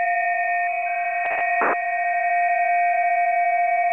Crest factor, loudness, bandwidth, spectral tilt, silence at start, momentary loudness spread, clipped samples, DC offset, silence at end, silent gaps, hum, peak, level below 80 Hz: 12 dB; -21 LUFS; 3.5 kHz; -4.5 dB/octave; 0 s; 3 LU; under 0.1%; 0.1%; 0 s; none; none; -8 dBFS; -74 dBFS